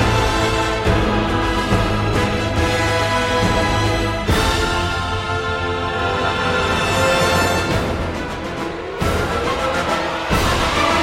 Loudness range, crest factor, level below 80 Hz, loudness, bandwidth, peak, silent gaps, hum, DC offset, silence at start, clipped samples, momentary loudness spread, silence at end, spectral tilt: 2 LU; 16 dB; -28 dBFS; -18 LUFS; 16.5 kHz; -2 dBFS; none; none; under 0.1%; 0 s; under 0.1%; 5 LU; 0 s; -4.5 dB/octave